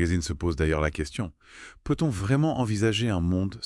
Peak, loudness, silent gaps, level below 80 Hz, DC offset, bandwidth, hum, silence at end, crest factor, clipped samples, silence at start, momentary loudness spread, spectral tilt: -10 dBFS; -26 LUFS; none; -42 dBFS; under 0.1%; 12 kHz; none; 0 s; 16 dB; under 0.1%; 0 s; 12 LU; -6 dB/octave